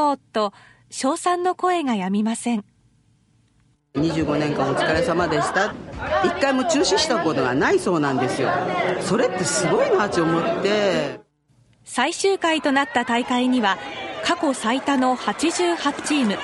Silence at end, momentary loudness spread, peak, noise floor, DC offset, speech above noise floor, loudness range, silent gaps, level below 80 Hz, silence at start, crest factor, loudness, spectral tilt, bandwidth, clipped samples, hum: 0 s; 6 LU; -4 dBFS; -61 dBFS; under 0.1%; 40 dB; 4 LU; none; -52 dBFS; 0 s; 18 dB; -21 LUFS; -4 dB/octave; 12 kHz; under 0.1%; none